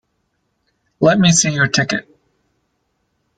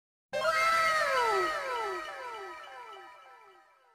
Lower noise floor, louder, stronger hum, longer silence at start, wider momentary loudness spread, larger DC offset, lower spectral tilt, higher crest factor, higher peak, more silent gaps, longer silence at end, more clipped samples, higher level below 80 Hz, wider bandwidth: first, -68 dBFS vs -60 dBFS; first, -14 LUFS vs -29 LUFS; neither; first, 1 s vs 0.3 s; second, 9 LU vs 20 LU; neither; first, -3.5 dB/octave vs -1.5 dB/octave; about the same, 18 dB vs 16 dB; first, -2 dBFS vs -16 dBFS; neither; first, 1.35 s vs 0.6 s; neither; first, -52 dBFS vs -68 dBFS; second, 9.4 kHz vs 15 kHz